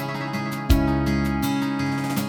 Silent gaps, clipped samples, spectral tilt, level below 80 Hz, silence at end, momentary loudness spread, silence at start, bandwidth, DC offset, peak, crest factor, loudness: none; under 0.1%; -6 dB/octave; -30 dBFS; 0 s; 7 LU; 0 s; 19.5 kHz; under 0.1%; -4 dBFS; 18 dB; -23 LUFS